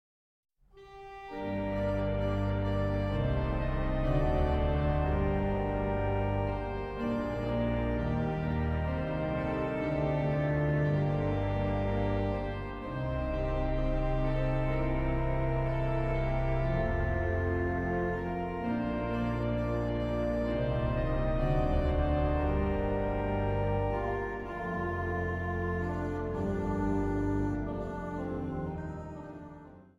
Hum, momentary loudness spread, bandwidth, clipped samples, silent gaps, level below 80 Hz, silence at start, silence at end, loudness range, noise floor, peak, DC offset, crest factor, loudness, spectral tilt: none; 7 LU; 7.4 kHz; under 0.1%; none; -36 dBFS; 0.75 s; 0.15 s; 3 LU; -53 dBFS; -16 dBFS; under 0.1%; 14 dB; -32 LUFS; -9 dB/octave